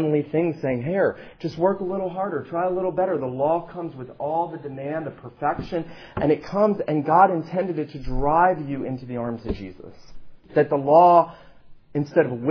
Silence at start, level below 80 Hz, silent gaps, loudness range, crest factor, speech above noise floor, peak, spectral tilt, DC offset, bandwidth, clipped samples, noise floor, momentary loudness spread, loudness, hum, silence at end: 0 s; -44 dBFS; none; 5 LU; 18 dB; 23 dB; -4 dBFS; -9 dB/octave; under 0.1%; 5.4 kHz; under 0.1%; -45 dBFS; 15 LU; -23 LUFS; none; 0 s